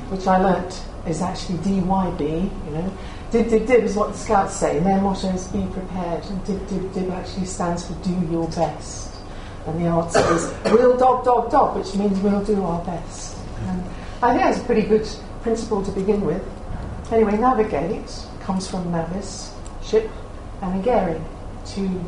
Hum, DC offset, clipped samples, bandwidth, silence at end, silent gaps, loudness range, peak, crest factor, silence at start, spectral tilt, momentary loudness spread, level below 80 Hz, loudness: none; under 0.1%; under 0.1%; 11 kHz; 0 s; none; 7 LU; 0 dBFS; 20 dB; 0 s; -6 dB/octave; 15 LU; -34 dBFS; -22 LUFS